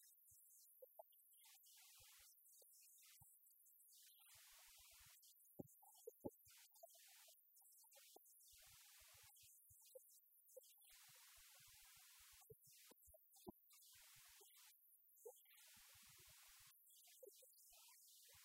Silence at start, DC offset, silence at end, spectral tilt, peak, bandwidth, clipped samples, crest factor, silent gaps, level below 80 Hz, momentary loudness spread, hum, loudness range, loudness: 0 s; under 0.1%; 0 s; -2.5 dB/octave; -38 dBFS; 16 kHz; under 0.1%; 30 dB; none; -90 dBFS; 4 LU; none; 3 LU; -66 LUFS